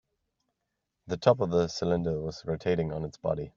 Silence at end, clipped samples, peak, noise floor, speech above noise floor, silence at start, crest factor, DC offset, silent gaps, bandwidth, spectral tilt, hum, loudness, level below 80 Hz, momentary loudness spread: 0.1 s; under 0.1%; -6 dBFS; -83 dBFS; 55 dB; 1.05 s; 24 dB; under 0.1%; none; 7.6 kHz; -6.5 dB/octave; none; -29 LUFS; -56 dBFS; 9 LU